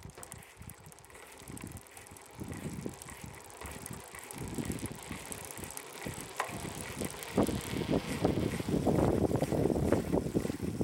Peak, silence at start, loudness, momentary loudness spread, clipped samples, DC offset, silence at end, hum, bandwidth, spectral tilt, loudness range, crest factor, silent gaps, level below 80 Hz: -10 dBFS; 0 s; -35 LUFS; 18 LU; under 0.1%; under 0.1%; 0 s; none; 17 kHz; -5.5 dB/octave; 14 LU; 24 dB; none; -50 dBFS